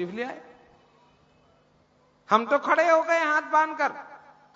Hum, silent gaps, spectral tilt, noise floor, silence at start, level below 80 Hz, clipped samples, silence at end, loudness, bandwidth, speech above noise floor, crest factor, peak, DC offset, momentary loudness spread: none; none; -4 dB/octave; -63 dBFS; 0 s; -76 dBFS; under 0.1%; 0.4 s; -23 LUFS; 7.8 kHz; 39 dB; 22 dB; -4 dBFS; under 0.1%; 15 LU